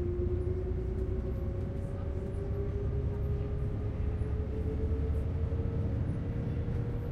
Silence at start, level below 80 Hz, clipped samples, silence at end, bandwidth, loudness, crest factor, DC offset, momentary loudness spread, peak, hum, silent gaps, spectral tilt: 0 s; -36 dBFS; under 0.1%; 0 s; 4.9 kHz; -35 LUFS; 12 dB; under 0.1%; 3 LU; -22 dBFS; none; none; -10 dB/octave